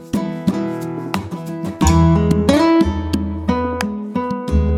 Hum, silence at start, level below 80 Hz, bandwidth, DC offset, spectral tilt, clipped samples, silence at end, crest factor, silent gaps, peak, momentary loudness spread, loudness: none; 0 s; -28 dBFS; 15 kHz; under 0.1%; -6.5 dB/octave; under 0.1%; 0 s; 16 dB; none; 0 dBFS; 11 LU; -18 LUFS